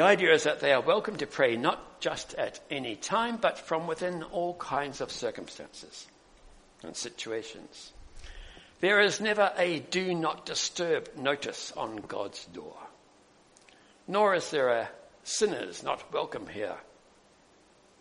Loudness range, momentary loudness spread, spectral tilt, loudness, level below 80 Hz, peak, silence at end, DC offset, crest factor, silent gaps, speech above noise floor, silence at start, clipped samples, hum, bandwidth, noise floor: 9 LU; 20 LU; -3 dB/octave; -29 LUFS; -60 dBFS; -6 dBFS; 1.2 s; under 0.1%; 24 dB; none; 31 dB; 0 s; under 0.1%; none; 10.5 kHz; -61 dBFS